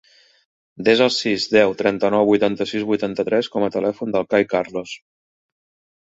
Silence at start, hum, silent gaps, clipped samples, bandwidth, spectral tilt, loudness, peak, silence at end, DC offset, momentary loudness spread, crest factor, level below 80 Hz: 0.8 s; none; none; under 0.1%; 8 kHz; -5 dB/octave; -19 LUFS; -2 dBFS; 1.05 s; under 0.1%; 7 LU; 18 dB; -60 dBFS